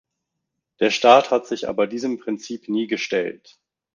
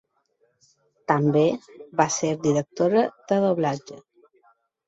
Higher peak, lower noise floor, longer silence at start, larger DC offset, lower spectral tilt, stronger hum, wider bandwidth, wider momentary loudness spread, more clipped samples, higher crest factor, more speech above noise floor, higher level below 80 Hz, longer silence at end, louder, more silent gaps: about the same, -2 dBFS vs -4 dBFS; first, -80 dBFS vs -68 dBFS; second, 0.8 s vs 1.1 s; neither; second, -4 dB/octave vs -5.5 dB/octave; neither; first, 9.6 kHz vs 8 kHz; about the same, 14 LU vs 13 LU; neither; about the same, 20 dB vs 20 dB; first, 60 dB vs 46 dB; about the same, -66 dBFS vs -66 dBFS; second, 0.6 s vs 0.9 s; first, -20 LUFS vs -23 LUFS; neither